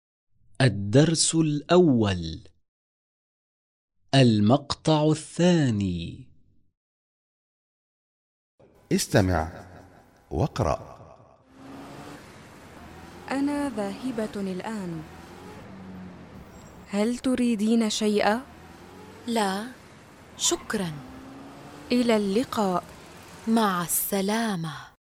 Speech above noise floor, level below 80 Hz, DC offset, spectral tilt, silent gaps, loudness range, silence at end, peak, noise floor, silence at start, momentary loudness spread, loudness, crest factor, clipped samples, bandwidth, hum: 30 dB; -52 dBFS; under 0.1%; -5 dB/octave; 2.68-3.88 s, 6.77-8.58 s; 10 LU; 0.25 s; -8 dBFS; -54 dBFS; 0.6 s; 23 LU; -25 LUFS; 20 dB; under 0.1%; 16 kHz; none